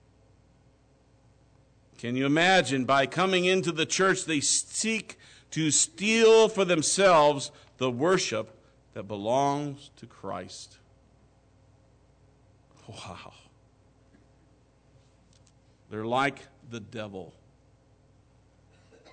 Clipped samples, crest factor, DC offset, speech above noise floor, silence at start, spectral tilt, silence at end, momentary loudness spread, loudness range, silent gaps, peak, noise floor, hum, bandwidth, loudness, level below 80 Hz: under 0.1%; 16 dB; under 0.1%; 36 dB; 2 s; -3 dB/octave; 1.85 s; 23 LU; 13 LU; none; -12 dBFS; -62 dBFS; none; 9.4 kHz; -25 LUFS; -66 dBFS